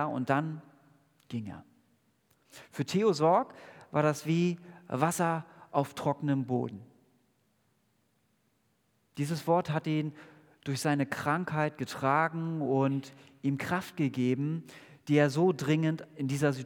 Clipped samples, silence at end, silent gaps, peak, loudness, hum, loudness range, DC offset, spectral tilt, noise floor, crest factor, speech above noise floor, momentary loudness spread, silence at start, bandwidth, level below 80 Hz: under 0.1%; 0 s; none; -10 dBFS; -31 LUFS; none; 6 LU; under 0.1%; -6.5 dB/octave; -73 dBFS; 20 dB; 43 dB; 15 LU; 0 s; 19 kHz; -76 dBFS